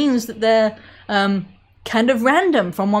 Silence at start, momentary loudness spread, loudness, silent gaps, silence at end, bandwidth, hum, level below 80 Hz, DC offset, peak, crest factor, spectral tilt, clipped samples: 0 s; 9 LU; -18 LUFS; none; 0 s; 16 kHz; none; -56 dBFS; under 0.1%; -2 dBFS; 16 dB; -5.5 dB/octave; under 0.1%